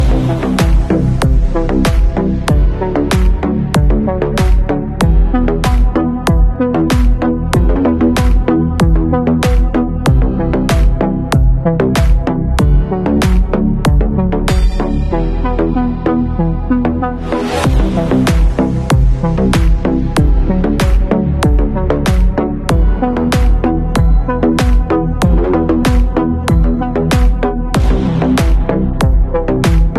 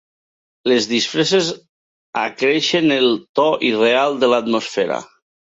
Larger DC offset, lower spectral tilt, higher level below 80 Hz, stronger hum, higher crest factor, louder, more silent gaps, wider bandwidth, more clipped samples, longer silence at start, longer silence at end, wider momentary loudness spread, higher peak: neither; first, -7 dB/octave vs -3.5 dB/octave; first, -14 dBFS vs -66 dBFS; neither; second, 10 dB vs 16 dB; first, -13 LUFS vs -17 LUFS; second, none vs 1.69-2.13 s, 3.29-3.35 s; first, 13 kHz vs 8 kHz; neither; second, 0 s vs 0.65 s; second, 0 s vs 0.55 s; second, 3 LU vs 9 LU; about the same, 0 dBFS vs -2 dBFS